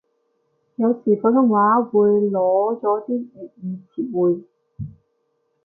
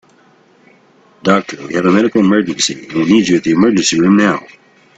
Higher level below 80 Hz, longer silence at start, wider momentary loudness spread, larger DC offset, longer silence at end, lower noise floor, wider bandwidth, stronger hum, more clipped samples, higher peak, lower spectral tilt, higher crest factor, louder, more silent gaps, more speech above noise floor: second, -60 dBFS vs -52 dBFS; second, 0.8 s vs 1.25 s; first, 20 LU vs 7 LU; neither; first, 0.75 s vs 0.5 s; first, -69 dBFS vs -49 dBFS; second, 1.8 kHz vs 9.2 kHz; neither; neither; second, -4 dBFS vs 0 dBFS; first, -14 dB/octave vs -4.5 dB/octave; about the same, 16 dB vs 14 dB; second, -19 LUFS vs -13 LUFS; neither; first, 51 dB vs 37 dB